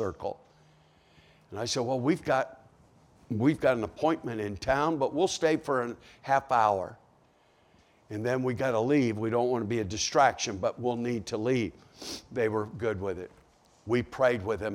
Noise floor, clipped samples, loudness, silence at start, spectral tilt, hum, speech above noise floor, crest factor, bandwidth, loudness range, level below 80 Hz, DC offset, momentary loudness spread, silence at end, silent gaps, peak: -64 dBFS; under 0.1%; -29 LUFS; 0 s; -5 dB/octave; none; 35 dB; 20 dB; 16 kHz; 4 LU; -60 dBFS; under 0.1%; 13 LU; 0 s; none; -10 dBFS